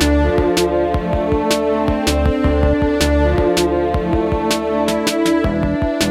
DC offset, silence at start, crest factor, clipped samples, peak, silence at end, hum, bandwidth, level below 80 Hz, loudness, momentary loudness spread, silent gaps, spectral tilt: under 0.1%; 0 s; 14 dB; under 0.1%; -2 dBFS; 0 s; none; 15.5 kHz; -24 dBFS; -16 LUFS; 3 LU; none; -5.5 dB/octave